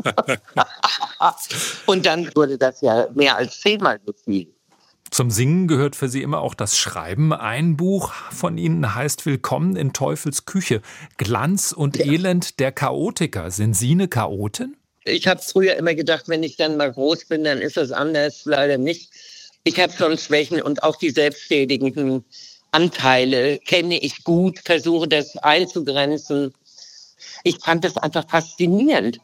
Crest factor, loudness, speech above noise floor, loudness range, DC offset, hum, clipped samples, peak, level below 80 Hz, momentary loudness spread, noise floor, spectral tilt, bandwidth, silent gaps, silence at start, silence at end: 18 dB; -20 LUFS; 40 dB; 3 LU; under 0.1%; none; under 0.1%; -2 dBFS; -60 dBFS; 7 LU; -59 dBFS; -4.5 dB/octave; 16.5 kHz; none; 0.05 s; 0.05 s